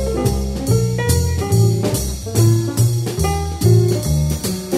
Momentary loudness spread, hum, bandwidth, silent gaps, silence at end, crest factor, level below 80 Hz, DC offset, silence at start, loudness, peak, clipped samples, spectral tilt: 5 LU; none; 16 kHz; none; 0 s; 14 dB; -28 dBFS; under 0.1%; 0 s; -17 LUFS; -2 dBFS; under 0.1%; -6 dB/octave